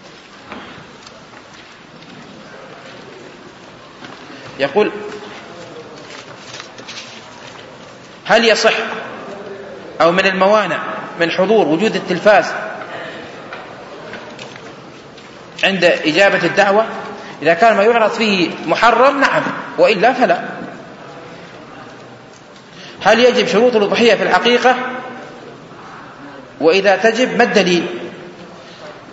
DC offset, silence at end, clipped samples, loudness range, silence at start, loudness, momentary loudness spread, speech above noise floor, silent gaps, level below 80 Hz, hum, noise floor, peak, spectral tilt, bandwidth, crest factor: under 0.1%; 0 s; under 0.1%; 14 LU; 0.05 s; -13 LUFS; 24 LU; 26 dB; none; -58 dBFS; none; -39 dBFS; 0 dBFS; -4 dB/octave; 8 kHz; 16 dB